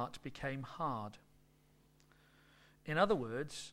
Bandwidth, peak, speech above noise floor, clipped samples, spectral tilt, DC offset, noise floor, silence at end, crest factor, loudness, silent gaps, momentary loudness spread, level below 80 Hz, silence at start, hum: 16.5 kHz; -18 dBFS; 31 dB; under 0.1%; -5.5 dB/octave; under 0.1%; -69 dBFS; 0 s; 24 dB; -39 LUFS; none; 12 LU; -64 dBFS; 0 s; none